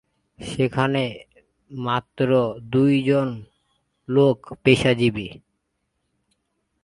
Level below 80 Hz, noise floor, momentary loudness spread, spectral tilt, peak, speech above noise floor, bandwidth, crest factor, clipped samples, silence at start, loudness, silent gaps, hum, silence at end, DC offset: -54 dBFS; -75 dBFS; 17 LU; -7 dB/octave; 0 dBFS; 54 dB; 11.5 kHz; 22 dB; under 0.1%; 0.4 s; -21 LUFS; none; none; 1.45 s; under 0.1%